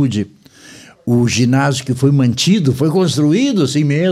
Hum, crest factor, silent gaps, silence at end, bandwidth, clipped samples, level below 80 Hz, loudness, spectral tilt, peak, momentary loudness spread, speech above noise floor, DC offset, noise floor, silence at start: none; 12 dB; none; 0 s; 14.5 kHz; under 0.1%; -50 dBFS; -14 LUFS; -6 dB/octave; -2 dBFS; 5 LU; 27 dB; under 0.1%; -40 dBFS; 0 s